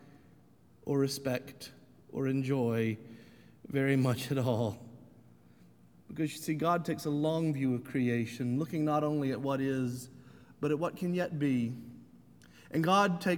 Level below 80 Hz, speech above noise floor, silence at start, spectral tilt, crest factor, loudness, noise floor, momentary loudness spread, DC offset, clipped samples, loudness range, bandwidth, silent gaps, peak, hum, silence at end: -72 dBFS; 30 dB; 0.05 s; -6.5 dB/octave; 20 dB; -32 LUFS; -62 dBFS; 16 LU; under 0.1%; under 0.1%; 3 LU; 19.5 kHz; none; -12 dBFS; none; 0 s